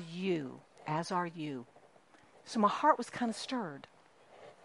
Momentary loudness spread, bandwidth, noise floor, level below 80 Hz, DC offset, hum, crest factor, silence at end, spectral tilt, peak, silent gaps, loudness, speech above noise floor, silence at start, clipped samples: 17 LU; 11.5 kHz; -63 dBFS; -82 dBFS; under 0.1%; none; 24 dB; 0.1 s; -5.5 dB/octave; -12 dBFS; none; -34 LUFS; 29 dB; 0 s; under 0.1%